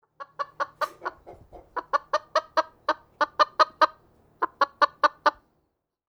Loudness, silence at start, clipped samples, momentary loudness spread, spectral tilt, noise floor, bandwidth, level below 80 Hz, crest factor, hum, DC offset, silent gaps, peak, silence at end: -26 LUFS; 0.2 s; under 0.1%; 15 LU; -2 dB/octave; -76 dBFS; over 20 kHz; -66 dBFS; 22 dB; none; under 0.1%; none; -4 dBFS; 0.75 s